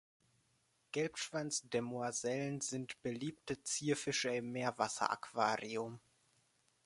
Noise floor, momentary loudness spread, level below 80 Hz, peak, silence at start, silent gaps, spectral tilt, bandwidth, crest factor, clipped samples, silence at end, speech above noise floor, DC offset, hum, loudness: -77 dBFS; 7 LU; -78 dBFS; -16 dBFS; 0.95 s; none; -3.5 dB/octave; 11.5 kHz; 24 dB; under 0.1%; 0.85 s; 38 dB; under 0.1%; none; -39 LUFS